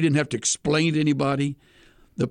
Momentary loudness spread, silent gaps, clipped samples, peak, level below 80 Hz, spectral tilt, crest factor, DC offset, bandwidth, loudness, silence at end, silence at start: 12 LU; none; under 0.1%; -8 dBFS; -56 dBFS; -4.5 dB/octave; 16 dB; under 0.1%; 11 kHz; -23 LUFS; 0 s; 0 s